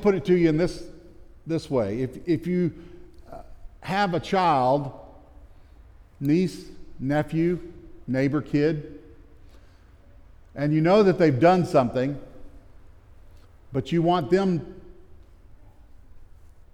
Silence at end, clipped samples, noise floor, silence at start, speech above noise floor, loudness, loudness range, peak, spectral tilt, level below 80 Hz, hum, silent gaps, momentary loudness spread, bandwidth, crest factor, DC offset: 0.5 s; under 0.1%; -51 dBFS; 0 s; 29 dB; -24 LUFS; 6 LU; -6 dBFS; -7.5 dB/octave; -48 dBFS; none; none; 24 LU; 13.5 kHz; 18 dB; under 0.1%